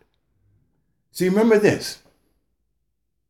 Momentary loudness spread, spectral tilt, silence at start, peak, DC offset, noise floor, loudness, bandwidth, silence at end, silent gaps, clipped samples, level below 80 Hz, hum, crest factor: 21 LU; -5.5 dB/octave; 1.15 s; -4 dBFS; under 0.1%; -76 dBFS; -19 LUFS; 16.5 kHz; 1.35 s; none; under 0.1%; -62 dBFS; none; 20 dB